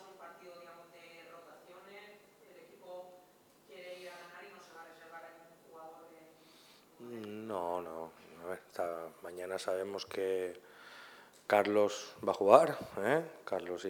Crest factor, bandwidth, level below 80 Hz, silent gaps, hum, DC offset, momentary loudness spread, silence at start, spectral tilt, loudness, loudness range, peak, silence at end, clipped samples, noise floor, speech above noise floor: 30 dB; 19 kHz; -84 dBFS; none; none; under 0.1%; 24 LU; 0 s; -4.5 dB/octave; -34 LUFS; 22 LU; -8 dBFS; 0 s; under 0.1%; -64 dBFS; 32 dB